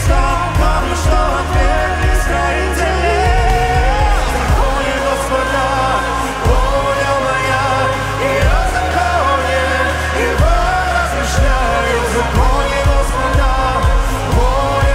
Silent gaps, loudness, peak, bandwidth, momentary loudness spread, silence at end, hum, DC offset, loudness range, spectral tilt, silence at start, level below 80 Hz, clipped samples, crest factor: none; -15 LUFS; 0 dBFS; 15.5 kHz; 2 LU; 0 s; none; under 0.1%; 1 LU; -5 dB/octave; 0 s; -18 dBFS; under 0.1%; 14 dB